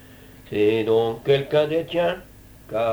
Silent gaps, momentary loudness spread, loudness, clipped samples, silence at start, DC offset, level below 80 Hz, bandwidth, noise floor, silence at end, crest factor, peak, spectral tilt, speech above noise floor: none; 10 LU; -22 LUFS; under 0.1%; 0.5 s; under 0.1%; -52 dBFS; over 20 kHz; -46 dBFS; 0 s; 16 dB; -8 dBFS; -6.5 dB/octave; 25 dB